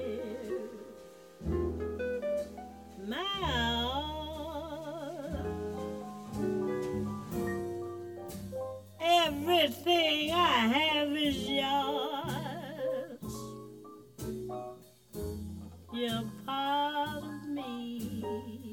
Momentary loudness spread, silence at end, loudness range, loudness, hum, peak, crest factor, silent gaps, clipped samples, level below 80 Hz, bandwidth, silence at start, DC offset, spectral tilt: 17 LU; 0 s; 11 LU; -33 LUFS; none; -14 dBFS; 20 dB; none; under 0.1%; -52 dBFS; 17.5 kHz; 0 s; under 0.1%; -4.5 dB/octave